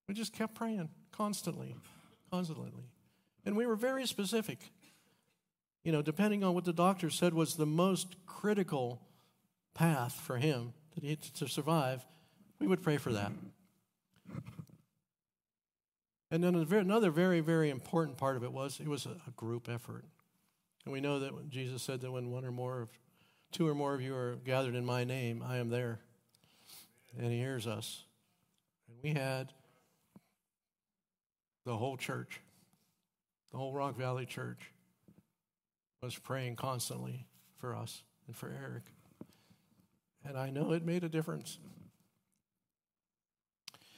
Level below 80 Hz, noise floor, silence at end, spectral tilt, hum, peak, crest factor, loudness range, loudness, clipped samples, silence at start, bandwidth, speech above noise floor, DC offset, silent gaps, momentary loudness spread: -80 dBFS; under -90 dBFS; 2.1 s; -6 dB/octave; none; -16 dBFS; 22 dB; 11 LU; -37 LUFS; under 0.1%; 0.1 s; 16 kHz; over 54 dB; under 0.1%; 15.88-15.92 s, 31.26-31.30 s; 19 LU